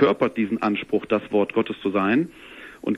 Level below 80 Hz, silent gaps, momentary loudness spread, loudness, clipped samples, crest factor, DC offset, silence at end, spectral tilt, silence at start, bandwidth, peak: -60 dBFS; none; 11 LU; -23 LUFS; under 0.1%; 18 dB; under 0.1%; 0 s; -7.5 dB/octave; 0 s; 12 kHz; -4 dBFS